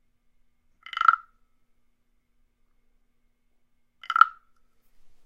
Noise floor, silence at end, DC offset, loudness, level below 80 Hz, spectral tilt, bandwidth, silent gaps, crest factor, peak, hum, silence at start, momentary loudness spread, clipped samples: -67 dBFS; 0.95 s; under 0.1%; -22 LUFS; -68 dBFS; 1 dB/octave; 7.6 kHz; none; 30 dB; 0 dBFS; none; 0.95 s; 10 LU; under 0.1%